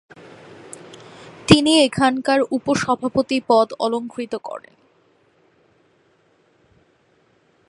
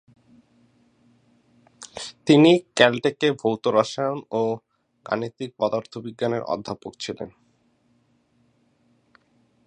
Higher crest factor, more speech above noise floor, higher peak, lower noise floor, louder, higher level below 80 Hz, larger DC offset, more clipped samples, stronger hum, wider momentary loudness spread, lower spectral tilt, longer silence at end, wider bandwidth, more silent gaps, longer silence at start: about the same, 22 dB vs 24 dB; about the same, 41 dB vs 43 dB; about the same, 0 dBFS vs 0 dBFS; second, -60 dBFS vs -64 dBFS; first, -18 LUFS vs -22 LUFS; first, -50 dBFS vs -68 dBFS; neither; neither; neither; first, 25 LU vs 19 LU; about the same, -4.5 dB/octave vs -5.5 dB/octave; first, 3.1 s vs 2.4 s; first, 11.5 kHz vs 10 kHz; neither; second, 0.5 s vs 1.8 s